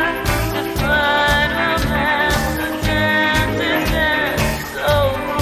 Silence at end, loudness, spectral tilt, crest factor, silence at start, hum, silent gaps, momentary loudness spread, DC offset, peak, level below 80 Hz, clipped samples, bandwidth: 0 s; -17 LUFS; -4.5 dB/octave; 14 dB; 0 s; none; none; 6 LU; under 0.1%; -2 dBFS; -28 dBFS; under 0.1%; 16 kHz